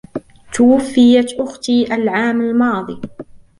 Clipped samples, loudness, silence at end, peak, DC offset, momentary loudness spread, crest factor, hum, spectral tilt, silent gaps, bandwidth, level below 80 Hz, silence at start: under 0.1%; -14 LUFS; 0.25 s; -2 dBFS; under 0.1%; 19 LU; 14 dB; none; -5 dB/octave; none; 11.5 kHz; -50 dBFS; 0.15 s